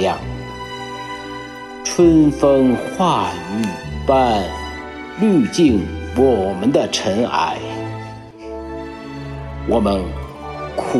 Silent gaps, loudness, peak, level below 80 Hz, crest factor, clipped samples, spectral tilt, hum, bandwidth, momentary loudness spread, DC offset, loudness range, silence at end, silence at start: none; -18 LUFS; -2 dBFS; -36 dBFS; 16 dB; under 0.1%; -5.5 dB/octave; none; 12.5 kHz; 16 LU; under 0.1%; 6 LU; 0 s; 0 s